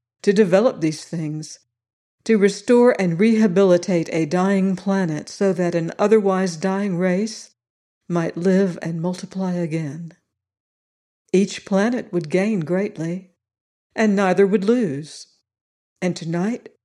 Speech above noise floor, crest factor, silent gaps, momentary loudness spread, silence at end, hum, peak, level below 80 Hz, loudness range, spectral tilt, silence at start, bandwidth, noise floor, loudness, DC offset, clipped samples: over 71 dB; 18 dB; 1.93-2.18 s, 7.70-8.01 s, 10.60-11.25 s, 13.61-13.90 s, 15.61-15.96 s; 12 LU; 0.25 s; none; -4 dBFS; -70 dBFS; 6 LU; -6.5 dB/octave; 0.25 s; 11 kHz; under -90 dBFS; -20 LUFS; under 0.1%; under 0.1%